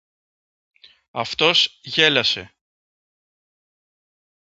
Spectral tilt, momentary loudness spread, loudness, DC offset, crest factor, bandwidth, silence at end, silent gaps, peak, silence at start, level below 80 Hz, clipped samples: -2.5 dB/octave; 12 LU; -18 LUFS; under 0.1%; 24 dB; 8 kHz; 2.05 s; none; 0 dBFS; 1.15 s; -62 dBFS; under 0.1%